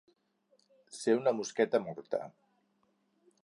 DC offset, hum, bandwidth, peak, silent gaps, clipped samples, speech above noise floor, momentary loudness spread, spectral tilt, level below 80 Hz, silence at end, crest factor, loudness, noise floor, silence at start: under 0.1%; none; 11 kHz; -14 dBFS; none; under 0.1%; 43 dB; 14 LU; -4.5 dB/octave; -84 dBFS; 1.15 s; 22 dB; -33 LUFS; -75 dBFS; 0.9 s